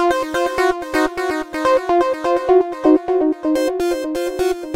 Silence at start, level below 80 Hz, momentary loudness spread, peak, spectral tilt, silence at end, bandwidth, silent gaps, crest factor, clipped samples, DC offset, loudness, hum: 0 s; -46 dBFS; 6 LU; -2 dBFS; -4 dB/octave; 0 s; 16 kHz; none; 16 dB; under 0.1%; under 0.1%; -18 LUFS; none